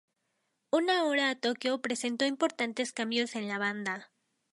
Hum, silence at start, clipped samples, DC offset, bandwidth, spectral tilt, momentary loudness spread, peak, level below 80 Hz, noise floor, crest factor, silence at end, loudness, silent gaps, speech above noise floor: none; 0.75 s; under 0.1%; under 0.1%; 11.5 kHz; -3 dB/octave; 6 LU; -16 dBFS; -84 dBFS; -80 dBFS; 16 dB; 0.45 s; -31 LUFS; none; 49 dB